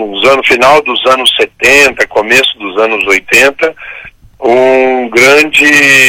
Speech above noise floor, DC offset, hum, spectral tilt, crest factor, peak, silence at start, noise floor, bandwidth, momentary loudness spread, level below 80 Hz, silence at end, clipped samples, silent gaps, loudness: 22 dB; under 0.1%; none; -2 dB/octave; 8 dB; 0 dBFS; 0 s; -29 dBFS; 17.5 kHz; 8 LU; -42 dBFS; 0 s; 0.7%; none; -6 LUFS